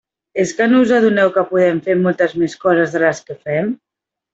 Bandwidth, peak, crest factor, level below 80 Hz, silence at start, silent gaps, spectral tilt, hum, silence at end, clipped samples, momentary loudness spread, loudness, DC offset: 8 kHz; -2 dBFS; 14 dB; -60 dBFS; 0.35 s; none; -6 dB/octave; none; 0.6 s; under 0.1%; 10 LU; -15 LUFS; under 0.1%